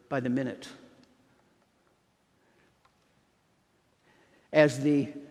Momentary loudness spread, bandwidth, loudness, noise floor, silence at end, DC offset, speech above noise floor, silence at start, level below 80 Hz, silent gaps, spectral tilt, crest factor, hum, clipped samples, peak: 18 LU; 12 kHz; -27 LUFS; -70 dBFS; 0.05 s; under 0.1%; 43 dB; 0.1 s; -76 dBFS; none; -6.5 dB/octave; 26 dB; none; under 0.1%; -6 dBFS